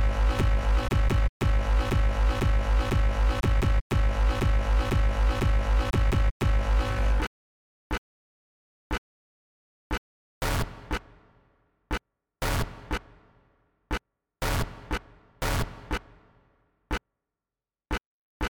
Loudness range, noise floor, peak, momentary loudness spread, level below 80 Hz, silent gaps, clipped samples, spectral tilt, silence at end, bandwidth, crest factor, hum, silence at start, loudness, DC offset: 10 LU; under -90 dBFS; -14 dBFS; 10 LU; -28 dBFS; 1.29-1.40 s, 3.81-3.90 s, 6.31-6.40 s, 7.27-7.90 s, 7.98-8.90 s, 8.98-9.90 s, 9.98-10.41 s, 18.06-18.40 s; under 0.1%; -5.5 dB/octave; 0 s; 18 kHz; 12 dB; none; 0 s; -29 LUFS; under 0.1%